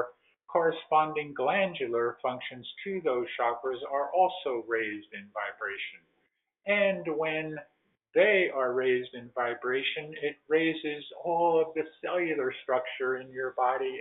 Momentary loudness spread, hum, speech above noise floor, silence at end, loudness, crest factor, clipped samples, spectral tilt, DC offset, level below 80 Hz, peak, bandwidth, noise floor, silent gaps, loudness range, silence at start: 11 LU; none; 47 dB; 0 s; -30 LUFS; 20 dB; under 0.1%; -2 dB/octave; under 0.1%; -78 dBFS; -10 dBFS; 4.1 kHz; -76 dBFS; none; 4 LU; 0 s